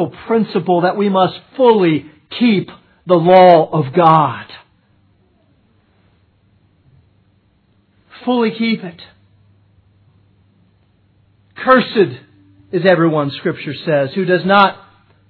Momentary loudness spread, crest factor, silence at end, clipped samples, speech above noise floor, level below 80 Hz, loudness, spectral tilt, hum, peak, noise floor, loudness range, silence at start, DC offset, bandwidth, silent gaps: 13 LU; 16 dB; 0.55 s; under 0.1%; 44 dB; -60 dBFS; -14 LUFS; -9.5 dB/octave; none; 0 dBFS; -57 dBFS; 11 LU; 0 s; under 0.1%; 5.4 kHz; none